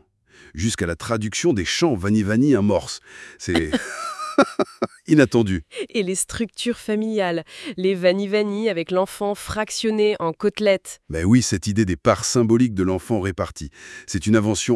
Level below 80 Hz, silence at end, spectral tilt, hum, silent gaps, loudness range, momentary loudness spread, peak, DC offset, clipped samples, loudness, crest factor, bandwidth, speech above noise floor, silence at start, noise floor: -48 dBFS; 0 s; -5 dB/octave; none; none; 3 LU; 11 LU; 0 dBFS; under 0.1%; under 0.1%; -21 LUFS; 20 dB; 12 kHz; 31 dB; 0.55 s; -51 dBFS